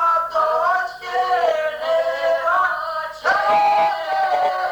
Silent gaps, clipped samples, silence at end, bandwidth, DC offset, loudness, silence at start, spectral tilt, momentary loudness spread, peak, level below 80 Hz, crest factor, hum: none; under 0.1%; 0 s; over 20 kHz; under 0.1%; -19 LUFS; 0 s; -2 dB/octave; 6 LU; -8 dBFS; -58 dBFS; 12 dB; none